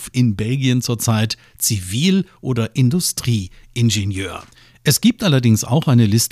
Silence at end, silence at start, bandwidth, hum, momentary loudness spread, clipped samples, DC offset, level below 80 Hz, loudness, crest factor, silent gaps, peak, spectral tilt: 0.05 s; 0 s; 16 kHz; none; 9 LU; under 0.1%; under 0.1%; -48 dBFS; -17 LUFS; 16 dB; none; -2 dBFS; -5 dB/octave